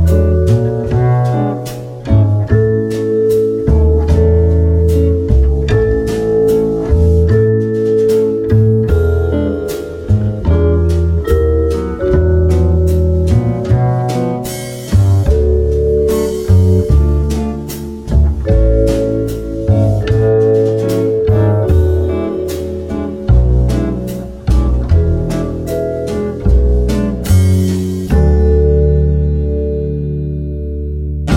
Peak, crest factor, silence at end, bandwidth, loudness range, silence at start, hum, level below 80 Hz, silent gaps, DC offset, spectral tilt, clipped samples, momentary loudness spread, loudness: 0 dBFS; 12 dB; 0 s; 16 kHz; 3 LU; 0 s; none; -16 dBFS; none; under 0.1%; -8.5 dB/octave; under 0.1%; 8 LU; -13 LUFS